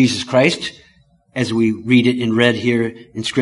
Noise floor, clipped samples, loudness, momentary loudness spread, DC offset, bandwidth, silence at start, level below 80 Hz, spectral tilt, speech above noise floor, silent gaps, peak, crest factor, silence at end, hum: -54 dBFS; under 0.1%; -17 LUFS; 10 LU; under 0.1%; 11.5 kHz; 0 s; -52 dBFS; -5.5 dB/octave; 37 dB; none; 0 dBFS; 16 dB; 0 s; none